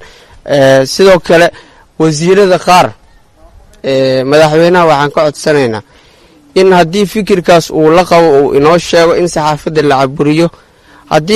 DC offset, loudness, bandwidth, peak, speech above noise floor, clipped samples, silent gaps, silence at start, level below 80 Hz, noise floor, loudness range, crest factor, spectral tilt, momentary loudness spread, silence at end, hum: under 0.1%; -8 LUFS; 15 kHz; 0 dBFS; 34 dB; 0.5%; none; 0 s; -38 dBFS; -42 dBFS; 2 LU; 8 dB; -5 dB/octave; 7 LU; 0 s; none